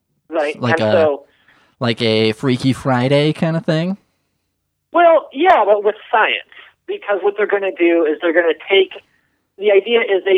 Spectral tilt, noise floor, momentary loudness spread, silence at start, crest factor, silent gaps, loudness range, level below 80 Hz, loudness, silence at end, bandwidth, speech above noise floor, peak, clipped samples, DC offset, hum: -6.5 dB/octave; -71 dBFS; 9 LU; 0.3 s; 14 dB; none; 2 LU; -60 dBFS; -16 LUFS; 0 s; 11 kHz; 56 dB; -2 dBFS; under 0.1%; under 0.1%; none